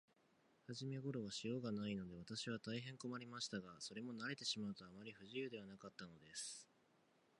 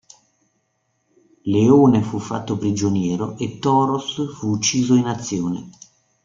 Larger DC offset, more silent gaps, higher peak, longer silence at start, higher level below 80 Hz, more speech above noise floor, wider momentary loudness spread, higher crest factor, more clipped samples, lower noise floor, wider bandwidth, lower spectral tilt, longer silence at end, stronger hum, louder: neither; neither; second, -30 dBFS vs -2 dBFS; second, 0.7 s vs 1.45 s; second, -82 dBFS vs -56 dBFS; second, 28 dB vs 51 dB; about the same, 11 LU vs 13 LU; about the same, 20 dB vs 18 dB; neither; first, -77 dBFS vs -69 dBFS; first, 11 kHz vs 7.6 kHz; second, -4 dB/octave vs -5.5 dB/octave; first, 0.75 s vs 0.55 s; neither; second, -49 LUFS vs -19 LUFS